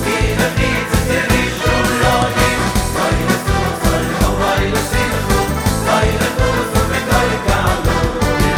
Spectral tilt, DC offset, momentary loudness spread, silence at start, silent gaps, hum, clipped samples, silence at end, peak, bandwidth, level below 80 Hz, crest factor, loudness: -4.5 dB/octave; under 0.1%; 3 LU; 0 s; none; none; under 0.1%; 0 s; 0 dBFS; 18 kHz; -22 dBFS; 14 dB; -15 LUFS